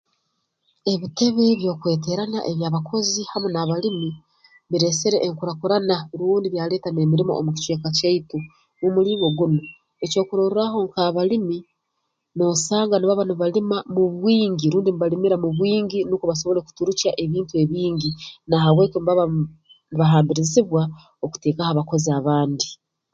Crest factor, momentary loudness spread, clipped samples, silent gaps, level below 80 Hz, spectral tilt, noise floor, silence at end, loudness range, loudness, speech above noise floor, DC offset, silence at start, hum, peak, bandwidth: 18 dB; 8 LU; under 0.1%; none; -58 dBFS; -5.5 dB/octave; -76 dBFS; 0.4 s; 3 LU; -21 LUFS; 55 dB; under 0.1%; 0.85 s; none; -4 dBFS; 9 kHz